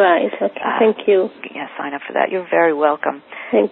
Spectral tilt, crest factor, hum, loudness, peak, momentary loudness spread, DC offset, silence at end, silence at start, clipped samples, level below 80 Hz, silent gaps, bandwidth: -10 dB/octave; 16 dB; none; -18 LUFS; 0 dBFS; 12 LU; under 0.1%; 0 s; 0 s; under 0.1%; -72 dBFS; none; 4.1 kHz